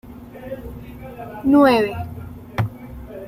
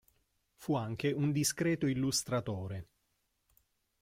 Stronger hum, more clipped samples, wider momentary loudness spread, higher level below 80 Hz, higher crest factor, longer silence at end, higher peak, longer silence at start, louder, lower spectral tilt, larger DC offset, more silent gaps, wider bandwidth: neither; neither; first, 23 LU vs 11 LU; first, -44 dBFS vs -64 dBFS; about the same, 18 dB vs 16 dB; second, 0 s vs 1.2 s; first, -2 dBFS vs -20 dBFS; second, 0.05 s vs 0.6 s; first, -18 LUFS vs -34 LUFS; first, -7.5 dB/octave vs -4.5 dB/octave; neither; neither; about the same, 15 kHz vs 16.5 kHz